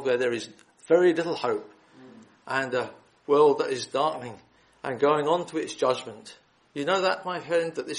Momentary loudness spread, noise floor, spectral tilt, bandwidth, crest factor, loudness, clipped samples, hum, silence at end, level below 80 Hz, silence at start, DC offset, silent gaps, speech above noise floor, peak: 17 LU; -51 dBFS; -4.5 dB/octave; 11 kHz; 18 dB; -26 LUFS; under 0.1%; none; 0 s; -72 dBFS; 0 s; under 0.1%; none; 25 dB; -8 dBFS